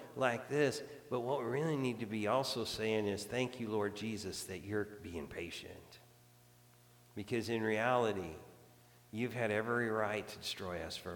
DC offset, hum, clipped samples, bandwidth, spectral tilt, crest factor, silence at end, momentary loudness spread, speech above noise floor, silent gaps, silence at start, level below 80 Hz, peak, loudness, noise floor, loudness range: under 0.1%; none; under 0.1%; 19 kHz; -5 dB/octave; 20 dB; 0 s; 11 LU; 26 dB; none; 0 s; -68 dBFS; -18 dBFS; -38 LUFS; -64 dBFS; 7 LU